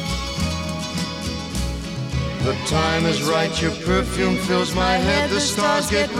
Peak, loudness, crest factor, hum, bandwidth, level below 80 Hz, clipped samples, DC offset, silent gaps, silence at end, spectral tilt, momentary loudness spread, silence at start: -4 dBFS; -21 LUFS; 16 dB; none; 17 kHz; -34 dBFS; under 0.1%; under 0.1%; none; 0 s; -4.5 dB/octave; 8 LU; 0 s